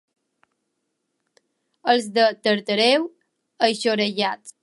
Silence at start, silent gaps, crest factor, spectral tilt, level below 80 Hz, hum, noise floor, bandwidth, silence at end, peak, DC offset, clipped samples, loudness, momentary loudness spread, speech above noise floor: 1.85 s; none; 20 dB; -3.5 dB/octave; -80 dBFS; none; -76 dBFS; 11.5 kHz; 0.15 s; -4 dBFS; under 0.1%; under 0.1%; -21 LUFS; 7 LU; 56 dB